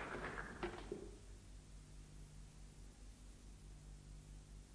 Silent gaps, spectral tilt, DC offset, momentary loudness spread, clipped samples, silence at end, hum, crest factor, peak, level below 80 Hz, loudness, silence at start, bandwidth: none; -5 dB/octave; under 0.1%; 13 LU; under 0.1%; 0 s; 50 Hz at -60 dBFS; 22 dB; -32 dBFS; -58 dBFS; -55 LUFS; 0 s; 11 kHz